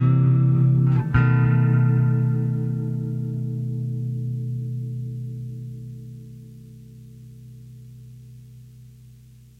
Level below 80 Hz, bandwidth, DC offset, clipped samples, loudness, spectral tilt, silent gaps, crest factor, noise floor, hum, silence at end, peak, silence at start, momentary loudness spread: -46 dBFS; 3.1 kHz; under 0.1%; under 0.1%; -22 LUFS; -10.5 dB/octave; none; 18 dB; -48 dBFS; 60 Hz at -60 dBFS; 0.75 s; -6 dBFS; 0 s; 25 LU